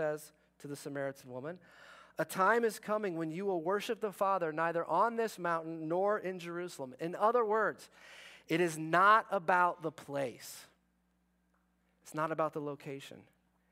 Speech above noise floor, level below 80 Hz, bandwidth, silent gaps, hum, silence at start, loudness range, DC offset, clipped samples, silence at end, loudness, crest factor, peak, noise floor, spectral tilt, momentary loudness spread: 42 dB; -82 dBFS; 16 kHz; none; none; 0 s; 8 LU; under 0.1%; under 0.1%; 0.5 s; -33 LUFS; 22 dB; -14 dBFS; -76 dBFS; -5 dB/octave; 19 LU